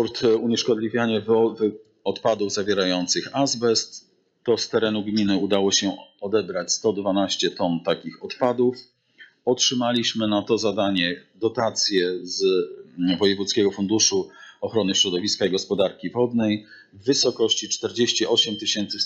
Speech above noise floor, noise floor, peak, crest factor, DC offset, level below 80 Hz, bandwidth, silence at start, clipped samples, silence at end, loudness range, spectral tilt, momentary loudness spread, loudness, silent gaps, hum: 30 dB; -52 dBFS; -6 dBFS; 16 dB; under 0.1%; -66 dBFS; 8.2 kHz; 0 s; under 0.1%; 0 s; 2 LU; -3.5 dB/octave; 7 LU; -22 LUFS; none; none